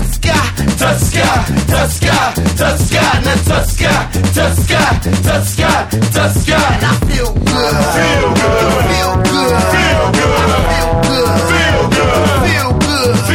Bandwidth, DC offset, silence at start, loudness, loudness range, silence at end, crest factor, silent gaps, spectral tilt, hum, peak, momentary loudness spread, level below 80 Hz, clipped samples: 18 kHz; under 0.1%; 0 s; -12 LUFS; 1 LU; 0 s; 12 dB; none; -4.5 dB/octave; none; 0 dBFS; 2 LU; -20 dBFS; under 0.1%